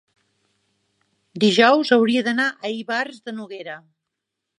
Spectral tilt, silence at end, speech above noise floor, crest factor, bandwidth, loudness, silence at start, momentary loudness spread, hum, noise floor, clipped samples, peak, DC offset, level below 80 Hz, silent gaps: -4.5 dB/octave; 0.8 s; 62 dB; 20 dB; 11 kHz; -19 LUFS; 1.35 s; 20 LU; none; -81 dBFS; under 0.1%; -2 dBFS; under 0.1%; -76 dBFS; none